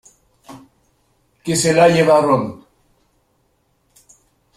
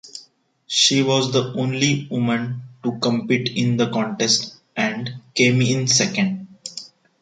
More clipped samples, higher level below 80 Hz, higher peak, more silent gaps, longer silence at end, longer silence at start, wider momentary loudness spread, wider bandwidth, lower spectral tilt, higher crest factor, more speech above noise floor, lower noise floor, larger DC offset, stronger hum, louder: neither; first, -56 dBFS vs -62 dBFS; about the same, -2 dBFS vs -2 dBFS; neither; first, 2.05 s vs 0.35 s; first, 0.5 s vs 0.05 s; about the same, 15 LU vs 14 LU; first, 15 kHz vs 9.4 kHz; about the same, -4.5 dB/octave vs -4 dB/octave; about the same, 18 dB vs 18 dB; first, 50 dB vs 34 dB; first, -63 dBFS vs -53 dBFS; neither; neither; first, -14 LUFS vs -20 LUFS